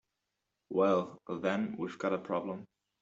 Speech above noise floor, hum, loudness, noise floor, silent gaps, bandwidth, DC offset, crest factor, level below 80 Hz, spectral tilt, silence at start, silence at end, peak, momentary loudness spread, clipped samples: 53 dB; none; -34 LUFS; -86 dBFS; none; 7.8 kHz; under 0.1%; 20 dB; -76 dBFS; -7 dB/octave; 0.7 s; 0.35 s; -16 dBFS; 11 LU; under 0.1%